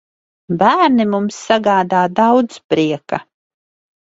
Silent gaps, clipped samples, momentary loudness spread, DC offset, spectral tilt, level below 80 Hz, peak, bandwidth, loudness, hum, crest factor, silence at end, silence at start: 2.64-2.69 s; under 0.1%; 10 LU; under 0.1%; -5.5 dB/octave; -58 dBFS; 0 dBFS; 8 kHz; -15 LUFS; none; 16 dB; 0.95 s; 0.5 s